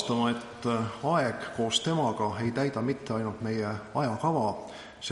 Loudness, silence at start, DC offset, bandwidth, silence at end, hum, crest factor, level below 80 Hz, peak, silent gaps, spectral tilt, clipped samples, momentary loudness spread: -30 LUFS; 0 s; under 0.1%; 11.5 kHz; 0 s; none; 18 dB; -62 dBFS; -12 dBFS; none; -5 dB/octave; under 0.1%; 5 LU